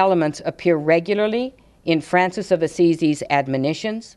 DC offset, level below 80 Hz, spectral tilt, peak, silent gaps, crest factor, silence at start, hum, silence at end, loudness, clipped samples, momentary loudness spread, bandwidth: under 0.1%; -58 dBFS; -6 dB/octave; -2 dBFS; none; 18 dB; 0 s; none; 0.1 s; -20 LUFS; under 0.1%; 7 LU; 11.5 kHz